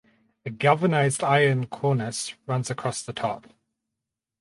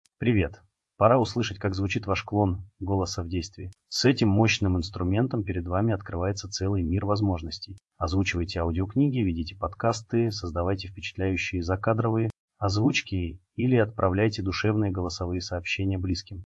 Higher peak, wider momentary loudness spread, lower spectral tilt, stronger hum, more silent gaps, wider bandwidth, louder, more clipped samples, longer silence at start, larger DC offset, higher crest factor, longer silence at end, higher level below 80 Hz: about the same, -4 dBFS vs -6 dBFS; about the same, 11 LU vs 10 LU; about the same, -5 dB/octave vs -6 dB/octave; neither; second, none vs 12.39-12.48 s; about the same, 11.5 kHz vs 12 kHz; first, -24 LUFS vs -27 LUFS; neither; first, 0.45 s vs 0.2 s; neither; about the same, 20 dB vs 20 dB; first, 1 s vs 0 s; second, -66 dBFS vs -50 dBFS